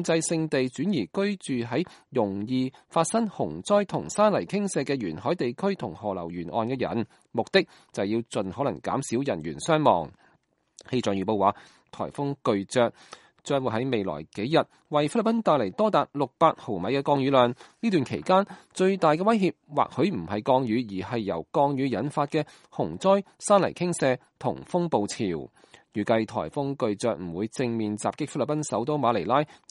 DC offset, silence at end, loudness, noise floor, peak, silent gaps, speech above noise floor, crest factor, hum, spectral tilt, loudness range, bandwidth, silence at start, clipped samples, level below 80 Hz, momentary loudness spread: under 0.1%; 0.25 s; -26 LUFS; -67 dBFS; -4 dBFS; none; 41 dB; 22 dB; none; -5.5 dB/octave; 4 LU; 11.5 kHz; 0 s; under 0.1%; -64 dBFS; 9 LU